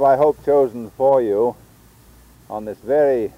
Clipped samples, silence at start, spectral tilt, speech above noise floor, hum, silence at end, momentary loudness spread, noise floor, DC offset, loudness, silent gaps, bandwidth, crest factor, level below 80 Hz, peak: under 0.1%; 0 s; -8 dB/octave; 31 dB; none; 0.1 s; 14 LU; -48 dBFS; under 0.1%; -18 LUFS; none; 16 kHz; 14 dB; -52 dBFS; -6 dBFS